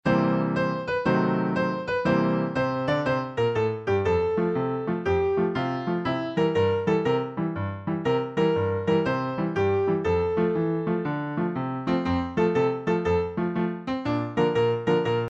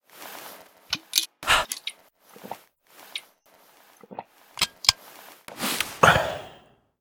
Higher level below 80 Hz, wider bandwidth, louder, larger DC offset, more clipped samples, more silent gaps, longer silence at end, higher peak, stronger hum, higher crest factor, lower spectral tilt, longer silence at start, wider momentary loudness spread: about the same, -52 dBFS vs -52 dBFS; second, 7.8 kHz vs over 20 kHz; about the same, -25 LUFS vs -23 LUFS; neither; neither; neither; second, 0 s vs 0.45 s; second, -10 dBFS vs 0 dBFS; neither; second, 16 dB vs 28 dB; first, -8 dB/octave vs -1.5 dB/octave; about the same, 0.05 s vs 0.15 s; second, 5 LU vs 24 LU